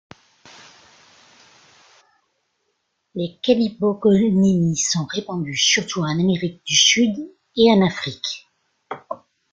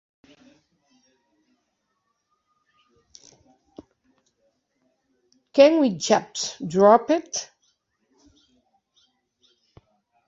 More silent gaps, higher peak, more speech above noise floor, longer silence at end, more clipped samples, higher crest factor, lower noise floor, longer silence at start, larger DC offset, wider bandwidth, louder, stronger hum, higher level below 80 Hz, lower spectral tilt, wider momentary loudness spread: neither; about the same, -2 dBFS vs -2 dBFS; about the same, 54 dB vs 56 dB; second, 0.35 s vs 2.85 s; neither; about the same, 20 dB vs 24 dB; about the same, -72 dBFS vs -75 dBFS; second, 3.15 s vs 5.55 s; neither; about the same, 8.2 kHz vs 7.8 kHz; about the same, -18 LUFS vs -20 LUFS; neither; first, -58 dBFS vs -70 dBFS; about the same, -4 dB/octave vs -4 dB/octave; first, 18 LU vs 15 LU